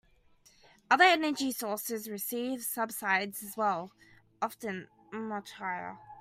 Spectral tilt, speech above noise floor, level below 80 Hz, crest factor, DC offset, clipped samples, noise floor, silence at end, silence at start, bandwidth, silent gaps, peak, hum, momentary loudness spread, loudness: -2.5 dB/octave; 32 dB; -76 dBFS; 24 dB; under 0.1%; under 0.1%; -64 dBFS; 0 s; 0.9 s; 16 kHz; none; -8 dBFS; none; 16 LU; -31 LUFS